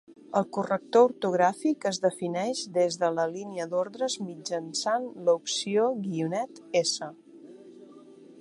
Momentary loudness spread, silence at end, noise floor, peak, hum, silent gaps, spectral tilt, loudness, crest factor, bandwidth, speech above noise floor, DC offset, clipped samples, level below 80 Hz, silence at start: 7 LU; 0 s; -50 dBFS; -8 dBFS; none; none; -4 dB/octave; -28 LUFS; 20 dB; 11.5 kHz; 23 dB; under 0.1%; under 0.1%; -80 dBFS; 0.1 s